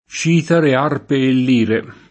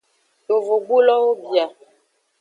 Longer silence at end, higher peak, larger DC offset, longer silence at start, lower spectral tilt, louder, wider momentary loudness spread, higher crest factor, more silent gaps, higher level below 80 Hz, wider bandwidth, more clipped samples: second, 0.15 s vs 0.7 s; about the same, -2 dBFS vs -4 dBFS; neither; second, 0.1 s vs 0.5 s; first, -6 dB/octave vs -4 dB/octave; first, -15 LUFS vs -18 LUFS; second, 4 LU vs 7 LU; about the same, 14 dB vs 16 dB; neither; first, -56 dBFS vs -84 dBFS; first, 8.6 kHz vs 7.6 kHz; neither